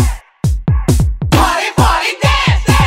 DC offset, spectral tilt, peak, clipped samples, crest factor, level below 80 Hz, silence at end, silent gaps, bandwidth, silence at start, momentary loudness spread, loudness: under 0.1%; -5 dB/octave; 0 dBFS; under 0.1%; 12 dB; -18 dBFS; 0 s; none; 16.5 kHz; 0 s; 6 LU; -13 LUFS